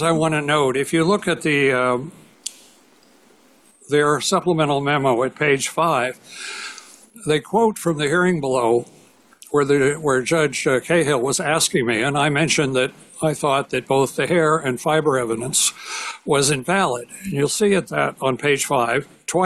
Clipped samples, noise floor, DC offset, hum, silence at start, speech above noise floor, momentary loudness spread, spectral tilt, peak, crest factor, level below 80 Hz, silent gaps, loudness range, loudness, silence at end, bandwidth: under 0.1%; -54 dBFS; under 0.1%; none; 0 s; 34 dB; 9 LU; -4 dB/octave; -6 dBFS; 14 dB; -56 dBFS; none; 3 LU; -19 LUFS; 0 s; 14.5 kHz